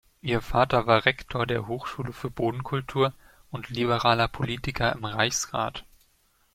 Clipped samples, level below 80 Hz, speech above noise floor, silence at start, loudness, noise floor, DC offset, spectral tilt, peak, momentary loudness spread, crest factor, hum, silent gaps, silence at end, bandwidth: under 0.1%; -46 dBFS; 39 dB; 0.25 s; -26 LUFS; -66 dBFS; under 0.1%; -4.5 dB/octave; -4 dBFS; 12 LU; 24 dB; none; none; 0.75 s; 16 kHz